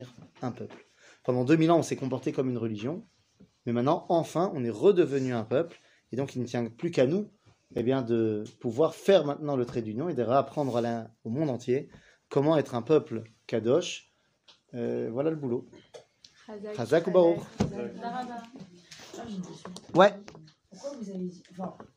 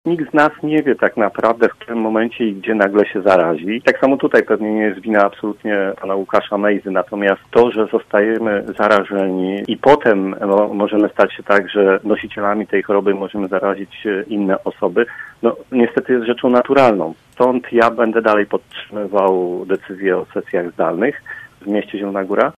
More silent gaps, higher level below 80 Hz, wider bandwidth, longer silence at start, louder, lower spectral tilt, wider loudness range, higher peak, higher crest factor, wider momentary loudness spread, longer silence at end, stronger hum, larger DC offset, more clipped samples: neither; second, -64 dBFS vs -56 dBFS; first, 15.5 kHz vs 11 kHz; about the same, 0 s vs 0.05 s; second, -28 LUFS vs -16 LUFS; about the same, -6.5 dB/octave vs -7 dB/octave; about the same, 3 LU vs 4 LU; second, -4 dBFS vs 0 dBFS; first, 24 dB vs 16 dB; first, 18 LU vs 8 LU; about the same, 0.15 s vs 0.05 s; neither; neither; neither